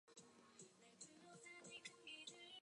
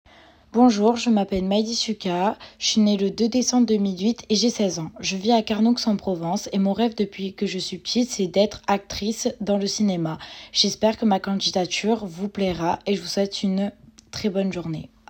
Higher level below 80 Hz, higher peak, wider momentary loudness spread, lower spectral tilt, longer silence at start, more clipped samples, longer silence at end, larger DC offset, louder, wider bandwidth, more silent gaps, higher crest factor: second, under -90 dBFS vs -54 dBFS; second, -42 dBFS vs -4 dBFS; about the same, 10 LU vs 8 LU; second, -1.5 dB/octave vs -4.5 dB/octave; second, 0.05 s vs 0.55 s; neither; second, 0 s vs 0.25 s; neither; second, -60 LUFS vs -23 LUFS; second, 11 kHz vs 16.5 kHz; neither; about the same, 20 dB vs 18 dB